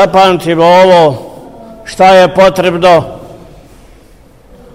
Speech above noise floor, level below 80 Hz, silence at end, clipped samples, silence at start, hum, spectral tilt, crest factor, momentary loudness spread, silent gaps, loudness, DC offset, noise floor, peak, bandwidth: 34 dB; -38 dBFS; 1.4 s; 0.8%; 0 s; none; -5.5 dB/octave; 8 dB; 20 LU; none; -6 LUFS; 0.5%; -40 dBFS; 0 dBFS; 15.5 kHz